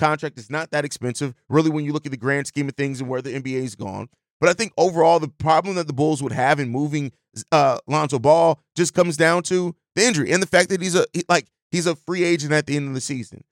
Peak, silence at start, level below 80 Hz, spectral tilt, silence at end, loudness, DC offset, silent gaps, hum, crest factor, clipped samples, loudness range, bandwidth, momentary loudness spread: -4 dBFS; 0 s; -62 dBFS; -4.5 dB/octave; 0.15 s; -21 LUFS; under 0.1%; 4.30-4.40 s, 11.62-11.70 s; none; 18 dB; under 0.1%; 5 LU; 16.5 kHz; 10 LU